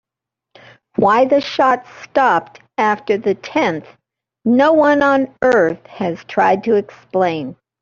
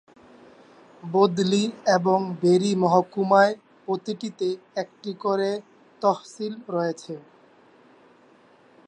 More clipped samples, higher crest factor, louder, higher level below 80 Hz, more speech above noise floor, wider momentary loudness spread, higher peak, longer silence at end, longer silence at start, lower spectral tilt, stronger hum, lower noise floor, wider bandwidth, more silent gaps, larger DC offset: neither; about the same, 16 dB vs 20 dB; first, -16 LUFS vs -24 LUFS; first, -58 dBFS vs -74 dBFS; first, 68 dB vs 33 dB; second, 11 LU vs 14 LU; about the same, -2 dBFS vs -4 dBFS; second, 0.3 s vs 1.7 s; about the same, 1 s vs 1.05 s; about the same, -6 dB/octave vs -6 dB/octave; neither; first, -84 dBFS vs -56 dBFS; second, 7.4 kHz vs 9.4 kHz; neither; neither